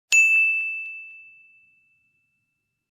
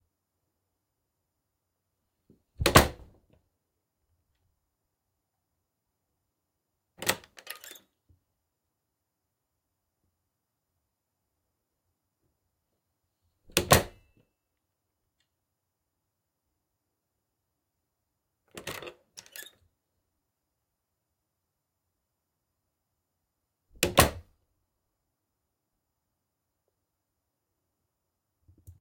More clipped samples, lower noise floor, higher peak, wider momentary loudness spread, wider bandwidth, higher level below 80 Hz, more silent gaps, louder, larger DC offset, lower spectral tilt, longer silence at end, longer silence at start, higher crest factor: neither; second, -77 dBFS vs -84 dBFS; second, -6 dBFS vs -2 dBFS; about the same, 23 LU vs 24 LU; about the same, 15 kHz vs 16.5 kHz; second, -86 dBFS vs -52 dBFS; neither; first, -18 LUFS vs -25 LUFS; neither; second, 5 dB/octave vs -3.5 dB/octave; second, 1.75 s vs 4.6 s; second, 0.1 s vs 2.6 s; second, 20 dB vs 34 dB